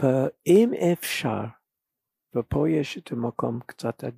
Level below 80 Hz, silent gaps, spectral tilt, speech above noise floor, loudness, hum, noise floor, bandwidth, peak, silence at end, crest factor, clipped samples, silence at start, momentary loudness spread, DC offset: -54 dBFS; none; -6.5 dB/octave; 62 dB; -25 LUFS; none; -86 dBFS; 15.5 kHz; -8 dBFS; 0.05 s; 18 dB; under 0.1%; 0 s; 13 LU; under 0.1%